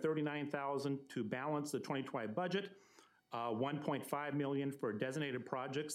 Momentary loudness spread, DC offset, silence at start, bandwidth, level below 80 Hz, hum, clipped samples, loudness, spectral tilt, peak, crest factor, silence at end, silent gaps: 3 LU; under 0.1%; 0 s; 16 kHz; under -90 dBFS; none; under 0.1%; -41 LUFS; -5.5 dB/octave; -24 dBFS; 16 dB; 0 s; none